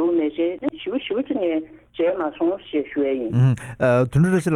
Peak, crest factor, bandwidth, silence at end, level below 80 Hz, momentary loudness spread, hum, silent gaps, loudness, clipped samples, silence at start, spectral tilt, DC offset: -6 dBFS; 14 dB; 12 kHz; 0 s; -52 dBFS; 8 LU; none; none; -22 LUFS; under 0.1%; 0 s; -8 dB/octave; under 0.1%